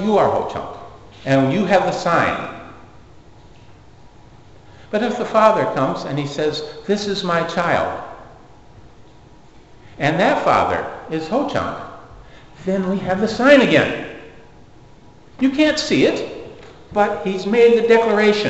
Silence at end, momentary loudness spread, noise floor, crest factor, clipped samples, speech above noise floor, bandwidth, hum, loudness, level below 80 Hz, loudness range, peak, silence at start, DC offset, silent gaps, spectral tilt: 0 s; 18 LU; -46 dBFS; 20 dB; under 0.1%; 29 dB; 8.2 kHz; none; -18 LUFS; -50 dBFS; 6 LU; 0 dBFS; 0 s; 0.4%; none; -5.5 dB/octave